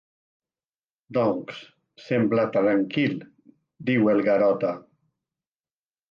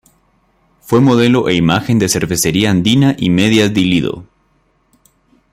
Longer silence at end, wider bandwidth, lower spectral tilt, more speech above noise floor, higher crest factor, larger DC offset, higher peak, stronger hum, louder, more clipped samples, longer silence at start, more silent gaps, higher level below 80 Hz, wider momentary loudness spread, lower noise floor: about the same, 1.3 s vs 1.3 s; second, 7 kHz vs 16 kHz; first, -8.5 dB/octave vs -5 dB/octave; first, over 67 dB vs 46 dB; about the same, 16 dB vs 14 dB; neither; second, -10 dBFS vs 0 dBFS; neither; second, -23 LUFS vs -12 LUFS; neither; first, 1.1 s vs 0.9 s; neither; second, -70 dBFS vs -44 dBFS; first, 15 LU vs 4 LU; first, under -90 dBFS vs -58 dBFS